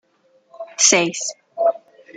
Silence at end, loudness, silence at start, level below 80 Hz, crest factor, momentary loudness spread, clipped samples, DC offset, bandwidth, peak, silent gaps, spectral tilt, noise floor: 0.4 s; -17 LUFS; 0.55 s; -70 dBFS; 22 dB; 22 LU; under 0.1%; under 0.1%; 10.5 kHz; 0 dBFS; none; -1 dB/octave; -59 dBFS